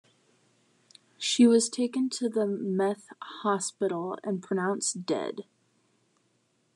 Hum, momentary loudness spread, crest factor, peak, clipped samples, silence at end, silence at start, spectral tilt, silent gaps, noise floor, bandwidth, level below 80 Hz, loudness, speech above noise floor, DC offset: none; 12 LU; 20 dB; -10 dBFS; under 0.1%; 1.35 s; 1.2 s; -4 dB/octave; none; -71 dBFS; 11 kHz; under -90 dBFS; -28 LUFS; 44 dB; under 0.1%